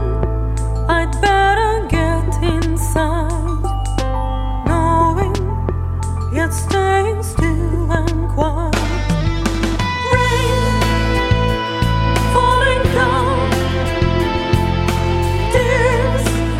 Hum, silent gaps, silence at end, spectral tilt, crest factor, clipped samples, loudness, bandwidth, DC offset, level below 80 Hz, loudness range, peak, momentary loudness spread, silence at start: none; none; 0 s; -5.5 dB/octave; 16 dB; under 0.1%; -17 LUFS; 15 kHz; under 0.1%; -22 dBFS; 3 LU; 0 dBFS; 6 LU; 0 s